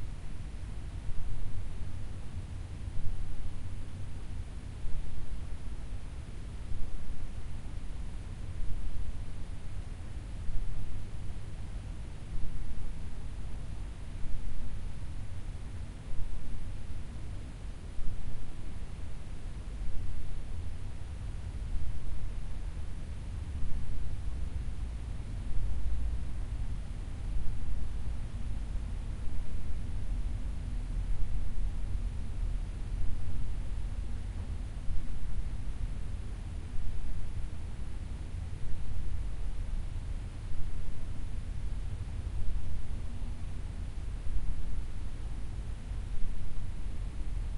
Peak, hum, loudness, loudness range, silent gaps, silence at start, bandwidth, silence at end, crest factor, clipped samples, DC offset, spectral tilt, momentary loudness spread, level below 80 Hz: -14 dBFS; none; -42 LUFS; 4 LU; none; 0 s; 10.5 kHz; 0 s; 14 dB; under 0.1%; under 0.1%; -6.5 dB/octave; 5 LU; -36 dBFS